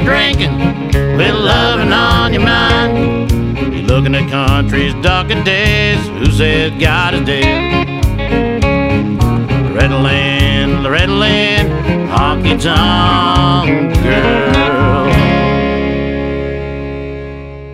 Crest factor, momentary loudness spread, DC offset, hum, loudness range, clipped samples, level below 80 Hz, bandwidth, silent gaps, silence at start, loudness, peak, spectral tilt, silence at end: 12 dB; 6 LU; under 0.1%; none; 2 LU; under 0.1%; -22 dBFS; 15 kHz; none; 0 s; -12 LUFS; 0 dBFS; -6 dB/octave; 0 s